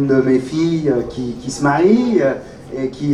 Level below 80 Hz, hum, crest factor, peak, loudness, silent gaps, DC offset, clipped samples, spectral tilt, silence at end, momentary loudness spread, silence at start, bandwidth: -44 dBFS; none; 14 dB; -2 dBFS; -17 LUFS; none; under 0.1%; under 0.1%; -6.5 dB/octave; 0 s; 12 LU; 0 s; 11.5 kHz